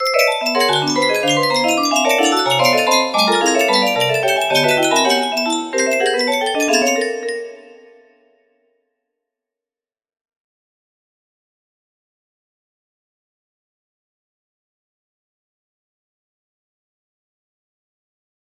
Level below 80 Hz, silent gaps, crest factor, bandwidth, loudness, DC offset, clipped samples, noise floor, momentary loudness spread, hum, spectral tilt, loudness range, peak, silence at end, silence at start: -68 dBFS; none; 18 dB; 16 kHz; -15 LUFS; under 0.1%; under 0.1%; under -90 dBFS; 5 LU; none; -2.5 dB/octave; 8 LU; -2 dBFS; 10.7 s; 0 s